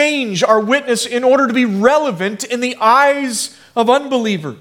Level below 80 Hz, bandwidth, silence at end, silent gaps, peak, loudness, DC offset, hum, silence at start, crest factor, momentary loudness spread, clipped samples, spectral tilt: -62 dBFS; 17 kHz; 0.05 s; none; 0 dBFS; -14 LUFS; under 0.1%; none; 0 s; 14 dB; 8 LU; under 0.1%; -3.5 dB/octave